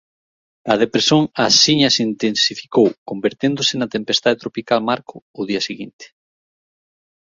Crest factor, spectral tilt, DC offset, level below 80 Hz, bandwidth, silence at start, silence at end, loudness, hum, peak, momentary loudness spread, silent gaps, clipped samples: 18 dB; -3.5 dB/octave; under 0.1%; -60 dBFS; 7.8 kHz; 0.65 s; 1.15 s; -17 LUFS; none; 0 dBFS; 12 LU; 2.98-3.06 s, 5.22-5.34 s, 5.93-5.99 s; under 0.1%